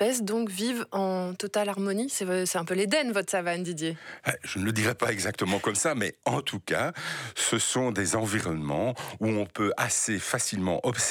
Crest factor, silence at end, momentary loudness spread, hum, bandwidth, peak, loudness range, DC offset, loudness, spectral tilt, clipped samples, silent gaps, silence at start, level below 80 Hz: 22 dB; 0 s; 6 LU; none; 19.5 kHz; -6 dBFS; 1 LU; under 0.1%; -28 LUFS; -3.5 dB/octave; under 0.1%; none; 0 s; -62 dBFS